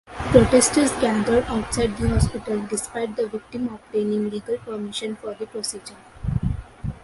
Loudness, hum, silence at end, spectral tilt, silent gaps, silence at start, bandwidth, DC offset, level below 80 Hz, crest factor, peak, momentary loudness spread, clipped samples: -23 LUFS; none; 0.05 s; -5 dB/octave; none; 0.1 s; 11.5 kHz; under 0.1%; -34 dBFS; 22 dB; 0 dBFS; 15 LU; under 0.1%